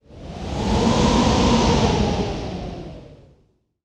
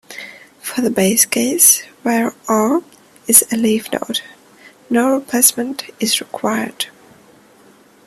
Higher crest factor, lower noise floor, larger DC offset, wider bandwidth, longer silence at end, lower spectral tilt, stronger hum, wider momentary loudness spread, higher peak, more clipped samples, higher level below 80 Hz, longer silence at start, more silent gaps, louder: about the same, 16 dB vs 18 dB; first, -61 dBFS vs -48 dBFS; neither; second, 11 kHz vs 15.5 kHz; second, 0.7 s vs 1.2 s; first, -5.5 dB/octave vs -2 dB/octave; neither; about the same, 17 LU vs 15 LU; second, -4 dBFS vs 0 dBFS; neither; first, -30 dBFS vs -62 dBFS; about the same, 0.1 s vs 0.1 s; neither; second, -19 LUFS vs -15 LUFS